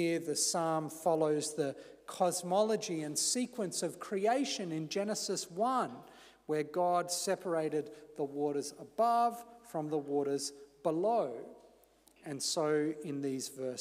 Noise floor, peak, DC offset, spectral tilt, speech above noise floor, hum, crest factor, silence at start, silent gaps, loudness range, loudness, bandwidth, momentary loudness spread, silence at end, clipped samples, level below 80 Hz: -65 dBFS; -18 dBFS; under 0.1%; -3.5 dB/octave; 31 dB; none; 18 dB; 0 s; none; 3 LU; -34 LUFS; 15.5 kHz; 10 LU; 0 s; under 0.1%; -80 dBFS